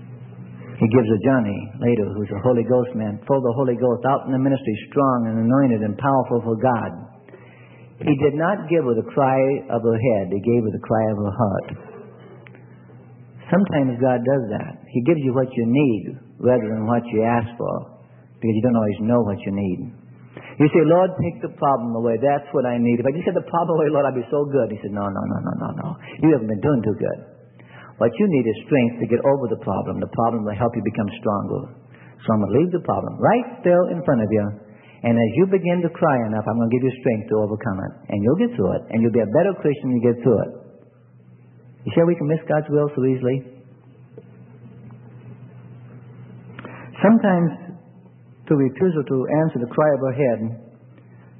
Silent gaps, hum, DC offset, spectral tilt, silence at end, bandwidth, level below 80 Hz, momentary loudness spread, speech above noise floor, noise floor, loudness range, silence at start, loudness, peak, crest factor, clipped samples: none; none; under 0.1%; -13 dB/octave; 0.75 s; 3.6 kHz; -58 dBFS; 10 LU; 30 dB; -49 dBFS; 3 LU; 0 s; -20 LUFS; -2 dBFS; 20 dB; under 0.1%